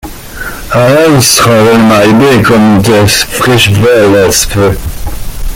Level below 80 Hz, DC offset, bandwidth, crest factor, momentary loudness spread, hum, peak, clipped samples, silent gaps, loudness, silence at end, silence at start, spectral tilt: -22 dBFS; under 0.1%; over 20 kHz; 6 dB; 16 LU; none; 0 dBFS; 0.3%; none; -5 LUFS; 0 s; 0.05 s; -4.5 dB/octave